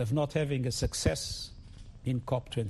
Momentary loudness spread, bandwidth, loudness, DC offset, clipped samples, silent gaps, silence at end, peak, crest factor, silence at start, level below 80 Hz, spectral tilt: 13 LU; 12.5 kHz; -32 LUFS; under 0.1%; under 0.1%; none; 0 s; -14 dBFS; 18 dB; 0 s; -44 dBFS; -5 dB/octave